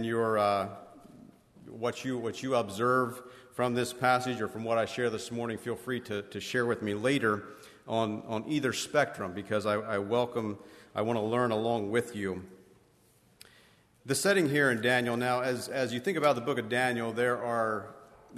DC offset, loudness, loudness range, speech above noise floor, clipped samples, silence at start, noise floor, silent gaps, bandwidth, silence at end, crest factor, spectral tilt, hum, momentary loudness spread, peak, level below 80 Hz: under 0.1%; -30 LUFS; 4 LU; 34 dB; under 0.1%; 0 s; -64 dBFS; none; 13.5 kHz; 0 s; 18 dB; -5 dB/octave; none; 10 LU; -12 dBFS; -70 dBFS